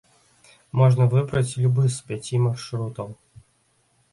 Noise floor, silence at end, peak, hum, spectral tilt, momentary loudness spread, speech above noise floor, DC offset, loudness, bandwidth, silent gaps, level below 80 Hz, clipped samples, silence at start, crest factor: -65 dBFS; 1 s; -6 dBFS; none; -7 dB/octave; 13 LU; 44 dB; under 0.1%; -22 LUFS; 11.5 kHz; none; -56 dBFS; under 0.1%; 0.75 s; 18 dB